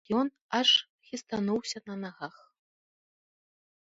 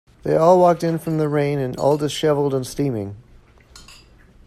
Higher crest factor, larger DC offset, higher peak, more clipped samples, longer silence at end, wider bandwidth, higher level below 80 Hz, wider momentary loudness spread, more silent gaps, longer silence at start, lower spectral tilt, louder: first, 22 dB vs 16 dB; neither; second, -10 dBFS vs -4 dBFS; neither; first, 1.7 s vs 0.55 s; second, 8 kHz vs 14.5 kHz; second, -74 dBFS vs -50 dBFS; first, 19 LU vs 10 LU; first, 0.41-0.49 s, 0.90-0.99 s vs none; second, 0.1 s vs 0.25 s; second, -3.5 dB/octave vs -6.5 dB/octave; second, -28 LUFS vs -19 LUFS